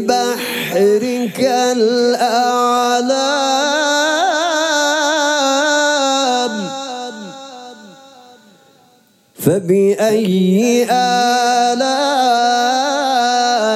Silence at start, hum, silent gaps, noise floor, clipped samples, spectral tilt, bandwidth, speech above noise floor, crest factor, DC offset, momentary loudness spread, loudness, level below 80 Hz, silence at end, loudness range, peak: 0 s; none; none; -53 dBFS; under 0.1%; -3.5 dB/octave; 16 kHz; 39 dB; 14 dB; under 0.1%; 6 LU; -14 LUFS; -66 dBFS; 0 s; 7 LU; 0 dBFS